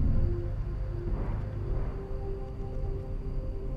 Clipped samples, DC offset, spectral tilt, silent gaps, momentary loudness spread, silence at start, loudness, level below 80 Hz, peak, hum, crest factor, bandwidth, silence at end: under 0.1%; under 0.1%; -10 dB/octave; none; 6 LU; 0 s; -36 LUFS; -32 dBFS; -16 dBFS; none; 14 dB; 5 kHz; 0 s